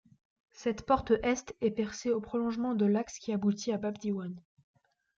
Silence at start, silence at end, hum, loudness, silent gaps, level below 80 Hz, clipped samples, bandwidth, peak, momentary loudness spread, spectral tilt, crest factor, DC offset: 0.6 s; 0.8 s; none; -32 LUFS; none; -60 dBFS; under 0.1%; 7.6 kHz; -14 dBFS; 7 LU; -6 dB/octave; 18 dB; under 0.1%